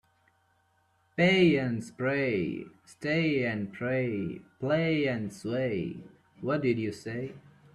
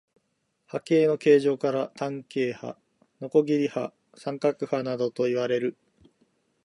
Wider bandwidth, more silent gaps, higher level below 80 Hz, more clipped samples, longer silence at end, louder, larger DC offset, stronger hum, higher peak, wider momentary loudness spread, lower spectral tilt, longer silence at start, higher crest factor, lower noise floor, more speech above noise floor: about the same, 12 kHz vs 11 kHz; neither; first, -66 dBFS vs -78 dBFS; neither; second, 0.35 s vs 0.95 s; second, -29 LUFS vs -26 LUFS; neither; neither; second, -12 dBFS vs -8 dBFS; about the same, 14 LU vs 16 LU; about the same, -7 dB/octave vs -6.5 dB/octave; first, 1.15 s vs 0.75 s; about the same, 20 dB vs 20 dB; second, -70 dBFS vs -75 dBFS; second, 41 dB vs 50 dB